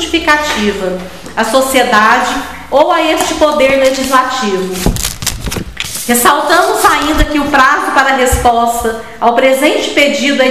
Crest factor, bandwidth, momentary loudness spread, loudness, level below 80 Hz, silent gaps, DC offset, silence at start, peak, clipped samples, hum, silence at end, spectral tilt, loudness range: 10 dB; 16 kHz; 10 LU; -10 LUFS; -26 dBFS; none; 1%; 0 s; 0 dBFS; 0.5%; none; 0 s; -3 dB/octave; 2 LU